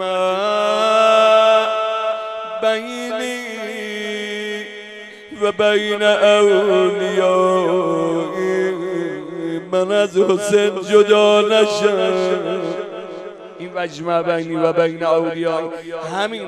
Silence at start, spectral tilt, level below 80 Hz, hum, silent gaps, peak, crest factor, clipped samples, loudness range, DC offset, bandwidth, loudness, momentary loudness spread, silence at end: 0 s; -4.5 dB/octave; -68 dBFS; none; none; 0 dBFS; 18 dB; under 0.1%; 6 LU; under 0.1%; 13 kHz; -17 LUFS; 14 LU; 0 s